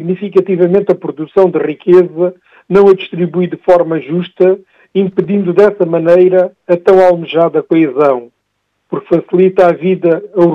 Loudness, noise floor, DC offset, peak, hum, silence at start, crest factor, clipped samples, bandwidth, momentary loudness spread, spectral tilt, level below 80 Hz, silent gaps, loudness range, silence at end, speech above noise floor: -11 LUFS; -66 dBFS; under 0.1%; 0 dBFS; none; 0 s; 10 dB; 0.8%; 5.6 kHz; 8 LU; -9 dB/octave; -54 dBFS; none; 2 LU; 0 s; 56 dB